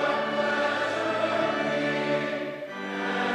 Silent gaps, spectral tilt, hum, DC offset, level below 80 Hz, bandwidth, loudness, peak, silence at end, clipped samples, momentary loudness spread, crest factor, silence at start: none; -4.5 dB/octave; none; under 0.1%; -74 dBFS; 11.5 kHz; -27 LUFS; -12 dBFS; 0 s; under 0.1%; 7 LU; 14 dB; 0 s